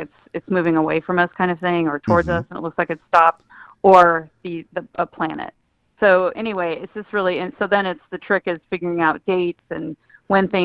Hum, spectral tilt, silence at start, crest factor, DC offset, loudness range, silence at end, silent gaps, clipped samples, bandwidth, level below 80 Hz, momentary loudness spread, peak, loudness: none; -7.5 dB/octave; 0 s; 20 dB; under 0.1%; 5 LU; 0 s; none; under 0.1%; 9.8 kHz; -50 dBFS; 14 LU; 0 dBFS; -19 LUFS